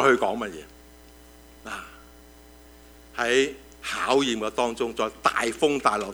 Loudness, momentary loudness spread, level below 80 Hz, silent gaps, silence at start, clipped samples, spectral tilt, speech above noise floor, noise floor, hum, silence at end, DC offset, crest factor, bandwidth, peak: -25 LUFS; 15 LU; -54 dBFS; none; 0 s; under 0.1%; -3 dB/octave; 25 dB; -50 dBFS; 60 Hz at -55 dBFS; 0 s; under 0.1%; 22 dB; over 20 kHz; -4 dBFS